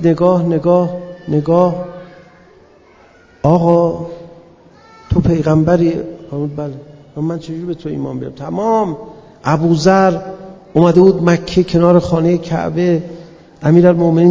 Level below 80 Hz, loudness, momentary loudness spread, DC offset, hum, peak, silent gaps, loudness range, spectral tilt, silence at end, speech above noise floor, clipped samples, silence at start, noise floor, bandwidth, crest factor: -38 dBFS; -14 LUFS; 17 LU; under 0.1%; none; 0 dBFS; none; 7 LU; -8 dB/octave; 0 s; 33 dB; 0.2%; 0 s; -45 dBFS; 7.6 kHz; 14 dB